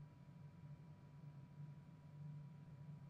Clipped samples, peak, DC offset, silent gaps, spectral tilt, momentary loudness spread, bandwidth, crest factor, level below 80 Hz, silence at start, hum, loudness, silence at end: under 0.1%; -46 dBFS; under 0.1%; none; -8.5 dB/octave; 5 LU; 8.2 kHz; 10 dB; -80 dBFS; 0 s; none; -59 LUFS; 0 s